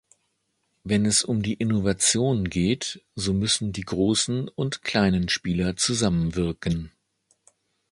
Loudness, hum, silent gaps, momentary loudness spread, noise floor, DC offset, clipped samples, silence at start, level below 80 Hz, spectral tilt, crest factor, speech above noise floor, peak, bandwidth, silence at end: -24 LUFS; none; none; 8 LU; -74 dBFS; under 0.1%; under 0.1%; 0.85 s; -44 dBFS; -4 dB/octave; 18 dB; 50 dB; -6 dBFS; 11.5 kHz; 1 s